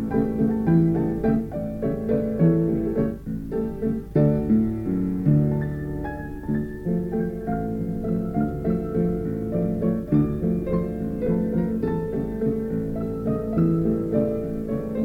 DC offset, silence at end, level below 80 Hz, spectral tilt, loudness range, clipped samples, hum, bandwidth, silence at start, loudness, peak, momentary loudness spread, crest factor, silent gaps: under 0.1%; 0 s; -40 dBFS; -11 dB/octave; 3 LU; under 0.1%; none; 15.5 kHz; 0 s; -24 LUFS; -8 dBFS; 8 LU; 16 dB; none